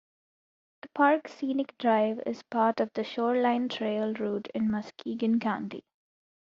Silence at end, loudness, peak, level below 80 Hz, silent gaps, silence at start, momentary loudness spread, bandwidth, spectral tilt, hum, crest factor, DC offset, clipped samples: 0.75 s; -29 LUFS; -10 dBFS; -72 dBFS; none; 0.85 s; 10 LU; 7.2 kHz; -4 dB/octave; none; 20 dB; under 0.1%; under 0.1%